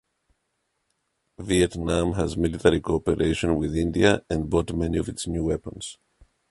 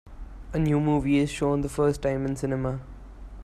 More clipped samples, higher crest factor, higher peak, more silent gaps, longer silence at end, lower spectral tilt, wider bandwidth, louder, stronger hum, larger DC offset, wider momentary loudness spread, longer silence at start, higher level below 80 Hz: neither; first, 22 dB vs 14 dB; first, -4 dBFS vs -12 dBFS; neither; first, 0.6 s vs 0 s; second, -5.5 dB/octave vs -7 dB/octave; second, 11.5 kHz vs 13 kHz; about the same, -24 LUFS vs -26 LUFS; neither; neither; second, 9 LU vs 23 LU; first, 1.4 s vs 0.05 s; about the same, -40 dBFS vs -40 dBFS